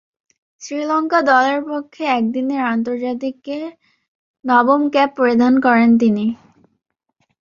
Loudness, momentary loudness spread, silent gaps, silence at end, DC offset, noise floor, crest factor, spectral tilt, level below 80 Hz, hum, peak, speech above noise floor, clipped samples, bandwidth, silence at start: -16 LUFS; 15 LU; 4.08-4.34 s; 1.05 s; under 0.1%; -67 dBFS; 16 dB; -5.5 dB/octave; -64 dBFS; none; -2 dBFS; 51 dB; under 0.1%; 7.2 kHz; 0.6 s